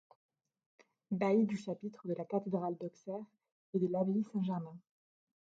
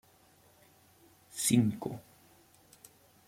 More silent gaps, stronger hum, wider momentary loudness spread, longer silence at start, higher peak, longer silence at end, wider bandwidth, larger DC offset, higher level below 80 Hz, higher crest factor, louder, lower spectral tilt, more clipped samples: first, 3.52-3.73 s vs none; neither; second, 13 LU vs 19 LU; second, 1.1 s vs 1.35 s; second, -20 dBFS vs -12 dBFS; second, 0.75 s vs 1.25 s; second, 7.8 kHz vs 16.5 kHz; neither; second, -84 dBFS vs -72 dBFS; second, 18 dB vs 24 dB; second, -37 LUFS vs -31 LUFS; first, -8.5 dB/octave vs -4.5 dB/octave; neither